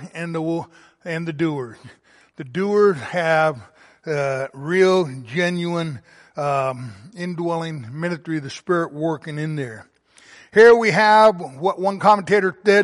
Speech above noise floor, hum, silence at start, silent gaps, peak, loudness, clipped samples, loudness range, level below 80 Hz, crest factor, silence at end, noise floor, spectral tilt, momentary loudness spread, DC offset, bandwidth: 31 dB; none; 0 s; none; -2 dBFS; -19 LUFS; under 0.1%; 9 LU; -64 dBFS; 18 dB; 0 s; -50 dBFS; -6 dB/octave; 17 LU; under 0.1%; 11.5 kHz